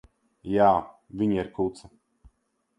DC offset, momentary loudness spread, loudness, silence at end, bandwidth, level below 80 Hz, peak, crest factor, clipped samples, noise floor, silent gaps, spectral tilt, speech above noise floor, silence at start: under 0.1%; 15 LU; -25 LUFS; 1 s; 10.5 kHz; -56 dBFS; -6 dBFS; 22 dB; under 0.1%; -72 dBFS; none; -8 dB/octave; 47 dB; 0.45 s